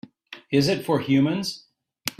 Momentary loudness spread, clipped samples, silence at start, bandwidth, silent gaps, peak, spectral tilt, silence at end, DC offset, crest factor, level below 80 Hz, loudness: 20 LU; under 0.1%; 0.3 s; 15.5 kHz; none; -4 dBFS; -5.5 dB/octave; 0.1 s; under 0.1%; 22 dB; -62 dBFS; -23 LUFS